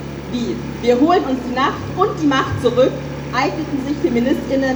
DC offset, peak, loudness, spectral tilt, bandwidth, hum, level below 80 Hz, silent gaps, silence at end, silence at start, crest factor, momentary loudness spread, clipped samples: under 0.1%; -2 dBFS; -18 LUFS; -6 dB/octave; over 20 kHz; none; -40 dBFS; none; 0 s; 0 s; 16 dB; 8 LU; under 0.1%